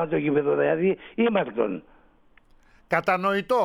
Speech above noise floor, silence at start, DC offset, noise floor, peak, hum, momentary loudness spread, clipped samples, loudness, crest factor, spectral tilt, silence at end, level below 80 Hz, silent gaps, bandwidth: 34 dB; 0 s; under 0.1%; -57 dBFS; -8 dBFS; none; 5 LU; under 0.1%; -24 LUFS; 16 dB; -7.5 dB/octave; 0 s; -60 dBFS; none; 14 kHz